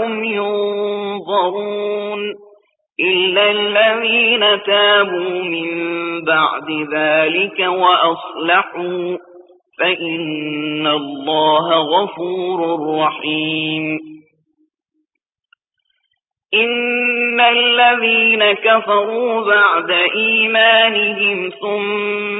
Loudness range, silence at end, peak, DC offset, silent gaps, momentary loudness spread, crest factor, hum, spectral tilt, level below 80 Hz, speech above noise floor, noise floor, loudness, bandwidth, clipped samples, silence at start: 8 LU; 0 s; 0 dBFS; under 0.1%; none; 10 LU; 16 dB; none; -9 dB/octave; -72 dBFS; 62 dB; -77 dBFS; -15 LUFS; 4 kHz; under 0.1%; 0 s